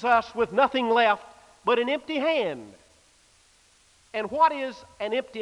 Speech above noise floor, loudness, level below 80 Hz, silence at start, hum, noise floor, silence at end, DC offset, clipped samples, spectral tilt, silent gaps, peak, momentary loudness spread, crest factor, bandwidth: 36 dB; -25 LUFS; -64 dBFS; 0 s; none; -60 dBFS; 0 s; under 0.1%; under 0.1%; -4.5 dB/octave; none; -8 dBFS; 12 LU; 18 dB; 11 kHz